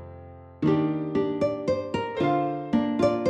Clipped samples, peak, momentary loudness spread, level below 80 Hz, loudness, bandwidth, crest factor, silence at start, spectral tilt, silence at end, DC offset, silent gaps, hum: under 0.1%; -10 dBFS; 9 LU; -56 dBFS; -26 LUFS; 8.8 kHz; 14 dB; 0 s; -7.5 dB/octave; 0 s; under 0.1%; none; none